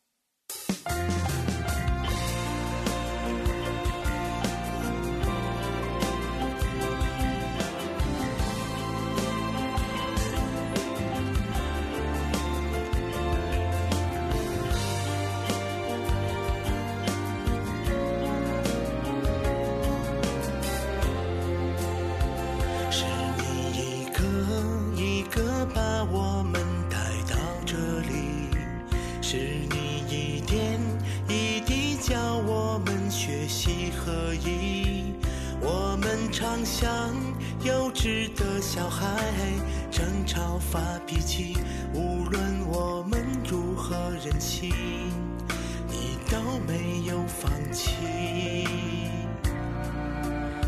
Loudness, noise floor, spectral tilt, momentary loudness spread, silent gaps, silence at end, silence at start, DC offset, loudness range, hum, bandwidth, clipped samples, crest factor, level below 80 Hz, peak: -29 LUFS; -53 dBFS; -5 dB/octave; 4 LU; none; 0 s; 0.5 s; under 0.1%; 2 LU; none; 14 kHz; under 0.1%; 16 dB; -34 dBFS; -12 dBFS